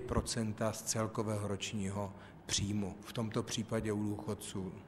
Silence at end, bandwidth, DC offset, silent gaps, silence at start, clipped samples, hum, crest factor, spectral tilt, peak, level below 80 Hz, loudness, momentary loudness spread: 0 s; 14.5 kHz; under 0.1%; none; 0 s; under 0.1%; none; 18 dB; -4.5 dB/octave; -20 dBFS; -54 dBFS; -38 LUFS; 6 LU